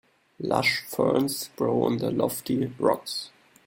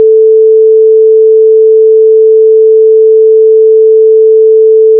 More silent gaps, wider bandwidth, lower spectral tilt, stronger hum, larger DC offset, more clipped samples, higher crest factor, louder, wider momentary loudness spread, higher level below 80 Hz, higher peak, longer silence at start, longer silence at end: neither; first, 17 kHz vs 0.5 kHz; second, -4.5 dB/octave vs -10.5 dB/octave; second, none vs 60 Hz at -95 dBFS; neither; neither; first, 20 dB vs 4 dB; second, -26 LUFS vs -4 LUFS; first, 9 LU vs 0 LU; first, -64 dBFS vs under -90 dBFS; second, -6 dBFS vs 0 dBFS; first, 0.4 s vs 0 s; first, 0.4 s vs 0 s